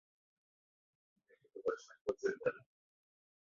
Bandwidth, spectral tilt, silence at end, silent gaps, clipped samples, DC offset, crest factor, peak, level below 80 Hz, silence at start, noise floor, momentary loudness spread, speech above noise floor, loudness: 7.4 kHz; -4 dB/octave; 1 s; 2.01-2.05 s; under 0.1%; under 0.1%; 24 dB; -22 dBFS; -82 dBFS; 1.55 s; under -90 dBFS; 15 LU; over 50 dB; -41 LUFS